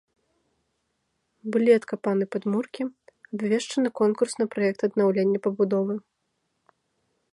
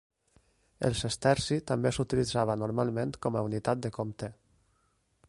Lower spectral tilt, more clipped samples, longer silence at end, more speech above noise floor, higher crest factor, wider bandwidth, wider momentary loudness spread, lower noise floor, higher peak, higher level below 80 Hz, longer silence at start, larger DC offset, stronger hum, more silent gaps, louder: about the same, -6 dB/octave vs -5.5 dB/octave; neither; first, 1.35 s vs 0.95 s; first, 52 dB vs 42 dB; about the same, 20 dB vs 20 dB; about the same, 11.5 kHz vs 11.5 kHz; about the same, 11 LU vs 9 LU; first, -76 dBFS vs -72 dBFS; first, -6 dBFS vs -12 dBFS; second, -74 dBFS vs -54 dBFS; first, 1.45 s vs 0.8 s; neither; neither; neither; first, -25 LUFS vs -31 LUFS